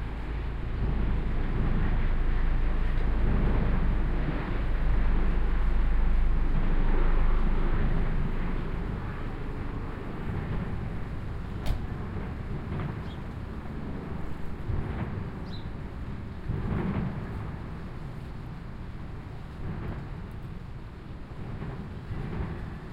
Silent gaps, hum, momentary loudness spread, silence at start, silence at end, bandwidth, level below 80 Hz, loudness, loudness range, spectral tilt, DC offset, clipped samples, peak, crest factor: none; none; 11 LU; 0 s; 0 s; 4.9 kHz; -28 dBFS; -33 LUFS; 9 LU; -8.5 dB/octave; under 0.1%; under 0.1%; -14 dBFS; 14 dB